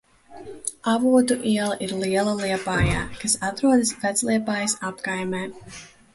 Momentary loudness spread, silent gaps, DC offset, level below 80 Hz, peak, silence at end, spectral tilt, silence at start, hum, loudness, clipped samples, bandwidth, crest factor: 14 LU; none; under 0.1%; -44 dBFS; -6 dBFS; 0.25 s; -4 dB/octave; 0.3 s; none; -23 LUFS; under 0.1%; 12 kHz; 16 dB